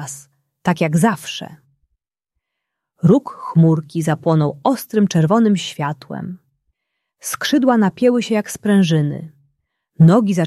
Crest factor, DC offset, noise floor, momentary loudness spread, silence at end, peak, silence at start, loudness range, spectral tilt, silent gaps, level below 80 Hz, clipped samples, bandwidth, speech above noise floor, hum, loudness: 16 dB; under 0.1%; -79 dBFS; 15 LU; 0 s; -2 dBFS; 0 s; 3 LU; -6.5 dB/octave; none; -60 dBFS; under 0.1%; 14 kHz; 63 dB; none; -16 LUFS